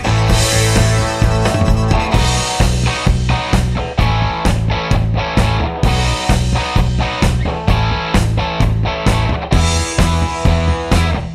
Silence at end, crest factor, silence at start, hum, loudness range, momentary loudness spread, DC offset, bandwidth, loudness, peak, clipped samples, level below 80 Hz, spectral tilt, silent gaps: 0 s; 14 dB; 0 s; none; 2 LU; 3 LU; under 0.1%; 14.5 kHz; -15 LUFS; 0 dBFS; under 0.1%; -20 dBFS; -5 dB/octave; none